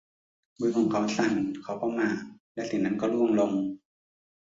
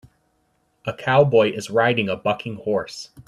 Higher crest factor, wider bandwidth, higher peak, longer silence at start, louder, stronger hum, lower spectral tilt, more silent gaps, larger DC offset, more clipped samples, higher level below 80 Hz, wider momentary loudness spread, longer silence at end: about the same, 16 dB vs 20 dB; second, 7.8 kHz vs 12.5 kHz; second, -12 dBFS vs -2 dBFS; second, 0.6 s vs 0.85 s; second, -28 LUFS vs -20 LUFS; neither; about the same, -6 dB/octave vs -5.5 dB/octave; first, 2.40-2.55 s vs none; neither; neither; second, -68 dBFS vs -60 dBFS; second, 11 LU vs 14 LU; first, 0.8 s vs 0.05 s